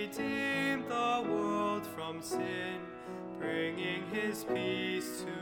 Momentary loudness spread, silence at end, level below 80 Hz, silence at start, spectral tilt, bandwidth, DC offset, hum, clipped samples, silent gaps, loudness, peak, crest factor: 9 LU; 0 s; -70 dBFS; 0 s; -4.5 dB/octave; 20 kHz; under 0.1%; none; under 0.1%; none; -35 LUFS; -20 dBFS; 16 dB